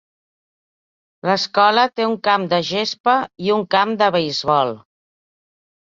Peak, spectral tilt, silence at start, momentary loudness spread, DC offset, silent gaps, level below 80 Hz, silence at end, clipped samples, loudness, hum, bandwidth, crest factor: -2 dBFS; -4.5 dB/octave; 1.25 s; 6 LU; under 0.1%; 3.00-3.04 s; -62 dBFS; 1.05 s; under 0.1%; -18 LUFS; none; 7.6 kHz; 18 dB